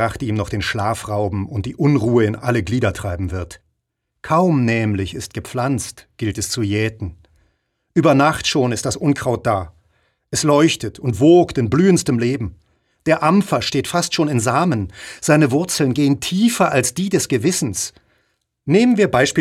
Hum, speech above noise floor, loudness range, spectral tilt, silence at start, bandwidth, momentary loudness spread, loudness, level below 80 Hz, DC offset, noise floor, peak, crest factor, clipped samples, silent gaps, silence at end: none; 58 dB; 4 LU; -5 dB/octave; 0 s; 16 kHz; 11 LU; -18 LUFS; -44 dBFS; under 0.1%; -75 dBFS; -2 dBFS; 16 dB; under 0.1%; none; 0 s